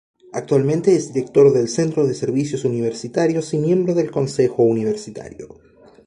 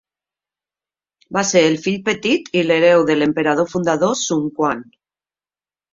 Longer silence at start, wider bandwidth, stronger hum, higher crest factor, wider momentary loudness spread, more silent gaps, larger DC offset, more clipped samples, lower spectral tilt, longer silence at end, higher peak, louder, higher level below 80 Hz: second, 0.35 s vs 1.3 s; first, 11 kHz vs 7.8 kHz; neither; about the same, 16 dB vs 18 dB; first, 15 LU vs 8 LU; neither; neither; neither; first, -6.5 dB/octave vs -4 dB/octave; second, 0.6 s vs 1.1 s; about the same, -2 dBFS vs -2 dBFS; about the same, -18 LUFS vs -17 LUFS; about the same, -58 dBFS vs -60 dBFS